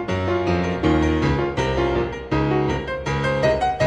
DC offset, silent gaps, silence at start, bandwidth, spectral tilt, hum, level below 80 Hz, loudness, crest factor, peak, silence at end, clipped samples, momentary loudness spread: under 0.1%; none; 0 s; 9.6 kHz; -7 dB/octave; none; -32 dBFS; -21 LUFS; 14 dB; -6 dBFS; 0 s; under 0.1%; 5 LU